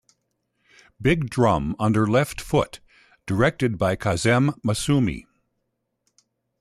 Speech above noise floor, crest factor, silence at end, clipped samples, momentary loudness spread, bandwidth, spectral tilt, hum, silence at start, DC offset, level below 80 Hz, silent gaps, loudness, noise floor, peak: 55 dB; 16 dB; 1.4 s; under 0.1%; 7 LU; 14 kHz; -6 dB/octave; none; 1 s; under 0.1%; -46 dBFS; none; -22 LUFS; -76 dBFS; -8 dBFS